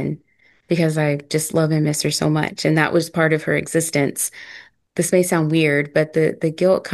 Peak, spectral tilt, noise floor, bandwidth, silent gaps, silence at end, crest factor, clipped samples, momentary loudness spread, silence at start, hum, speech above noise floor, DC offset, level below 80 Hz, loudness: -2 dBFS; -5 dB/octave; -58 dBFS; 12.5 kHz; none; 0 s; 18 dB; under 0.1%; 7 LU; 0 s; none; 39 dB; under 0.1%; -60 dBFS; -19 LUFS